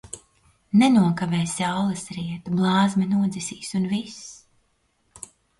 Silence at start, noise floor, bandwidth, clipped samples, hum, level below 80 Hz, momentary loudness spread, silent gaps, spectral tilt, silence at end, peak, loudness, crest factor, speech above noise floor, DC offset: 0.15 s; -68 dBFS; 11.5 kHz; under 0.1%; none; -60 dBFS; 22 LU; none; -5.5 dB/octave; 1.25 s; -8 dBFS; -23 LUFS; 16 dB; 46 dB; under 0.1%